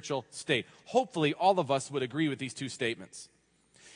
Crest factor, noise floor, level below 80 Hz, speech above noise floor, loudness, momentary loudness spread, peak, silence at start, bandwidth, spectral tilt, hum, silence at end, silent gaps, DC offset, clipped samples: 18 dB; -65 dBFS; -78 dBFS; 34 dB; -31 LUFS; 11 LU; -14 dBFS; 0.05 s; 10.5 kHz; -4.5 dB/octave; none; 0.05 s; none; under 0.1%; under 0.1%